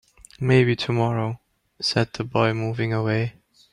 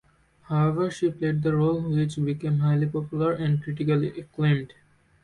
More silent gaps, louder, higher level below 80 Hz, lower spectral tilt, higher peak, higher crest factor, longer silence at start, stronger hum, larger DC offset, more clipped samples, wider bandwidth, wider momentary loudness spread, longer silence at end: neither; about the same, -23 LUFS vs -25 LUFS; about the same, -56 dBFS vs -58 dBFS; second, -6.5 dB/octave vs -8.5 dB/octave; first, -6 dBFS vs -12 dBFS; first, 18 dB vs 12 dB; about the same, 0.4 s vs 0.5 s; neither; neither; neither; about the same, 11 kHz vs 10.5 kHz; first, 10 LU vs 5 LU; second, 0.45 s vs 0.6 s